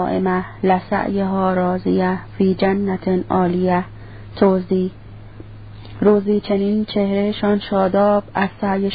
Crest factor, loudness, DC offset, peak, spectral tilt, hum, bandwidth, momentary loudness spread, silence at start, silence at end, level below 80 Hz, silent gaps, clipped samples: 16 dB; -18 LUFS; 0.5%; -2 dBFS; -12.5 dB/octave; none; 5 kHz; 15 LU; 0 s; 0 s; -44 dBFS; none; under 0.1%